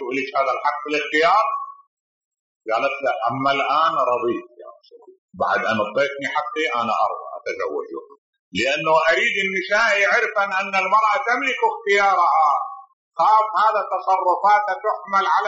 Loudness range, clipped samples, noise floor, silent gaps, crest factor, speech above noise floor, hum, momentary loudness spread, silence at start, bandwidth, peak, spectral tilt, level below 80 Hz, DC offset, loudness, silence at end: 5 LU; under 0.1%; -46 dBFS; 1.87-2.31 s, 2.39-2.60 s, 5.18-5.28 s, 8.18-8.33 s, 8.39-8.52 s, 12.93-13.11 s; 14 dB; 26 dB; none; 10 LU; 0 s; 8 kHz; -6 dBFS; -0.5 dB/octave; -68 dBFS; under 0.1%; -19 LUFS; 0 s